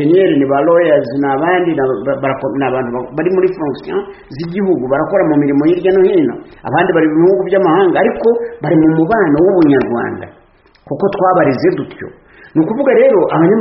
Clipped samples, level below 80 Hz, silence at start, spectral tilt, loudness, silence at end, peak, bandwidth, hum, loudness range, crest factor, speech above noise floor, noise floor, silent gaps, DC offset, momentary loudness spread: under 0.1%; -48 dBFS; 0 s; -6.5 dB/octave; -12 LUFS; 0 s; 0 dBFS; 5.8 kHz; none; 4 LU; 12 dB; 35 dB; -46 dBFS; none; under 0.1%; 11 LU